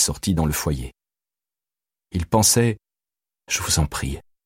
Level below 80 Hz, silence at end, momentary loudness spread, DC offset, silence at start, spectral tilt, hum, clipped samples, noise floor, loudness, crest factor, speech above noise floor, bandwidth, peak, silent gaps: -36 dBFS; 0.25 s; 15 LU; under 0.1%; 0 s; -3.5 dB/octave; none; under 0.1%; under -90 dBFS; -21 LUFS; 20 dB; over 69 dB; 16.5 kHz; -4 dBFS; none